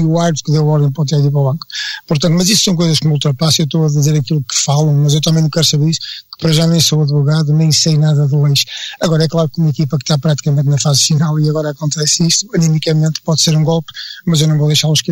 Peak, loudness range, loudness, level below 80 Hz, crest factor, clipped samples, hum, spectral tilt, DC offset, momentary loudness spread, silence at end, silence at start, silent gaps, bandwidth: -2 dBFS; 1 LU; -13 LUFS; -48 dBFS; 12 dB; under 0.1%; none; -5 dB/octave; under 0.1%; 6 LU; 0 s; 0 s; none; 16.5 kHz